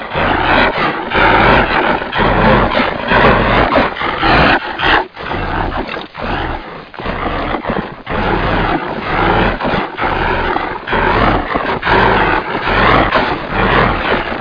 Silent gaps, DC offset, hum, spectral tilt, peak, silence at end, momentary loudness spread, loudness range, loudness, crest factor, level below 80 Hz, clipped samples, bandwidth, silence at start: none; under 0.1%; none; -7.5 dB/octave; 0 dBFS; 0 s; 10 LU; 7 LU; -13 LUFS; 14 dB; -26 dBFS; under 0.1%; 5.2 kHz; 0 s